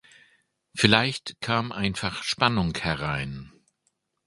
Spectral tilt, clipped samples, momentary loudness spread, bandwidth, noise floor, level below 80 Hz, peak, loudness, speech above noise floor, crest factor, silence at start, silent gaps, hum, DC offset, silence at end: -4.5 dB/octave; under 0.1%; 13 LU; 11.5 kHz; -74 dBFS; -50 dBFS; 0 dBFS; -25 LUFS; 49 dB; 28 dB; 0.75 s; none; none; under 0.1%; 0.75 s